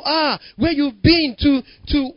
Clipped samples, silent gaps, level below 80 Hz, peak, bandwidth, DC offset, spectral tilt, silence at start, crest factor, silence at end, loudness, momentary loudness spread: under 0.1%; none; -32 dBFS; -2 dBFS; 5.4 kHz; under 0.1%; -9.5 dB/octave; 0.05 s; 16 dB; 0.05 s; -18 LUFS; 7 LU